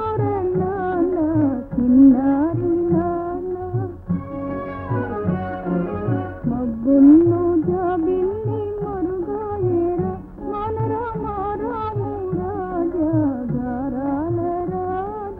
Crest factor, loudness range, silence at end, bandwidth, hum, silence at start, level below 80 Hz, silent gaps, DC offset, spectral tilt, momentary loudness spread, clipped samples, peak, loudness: 16 dB; 7 LU; 0 s; 3.7 kHz; none; 0 s; -42 dBFS; none; under 0.1%; -12 dB/octave; 12 LU; under 0.1%; -4 dBFS; -21 LUFS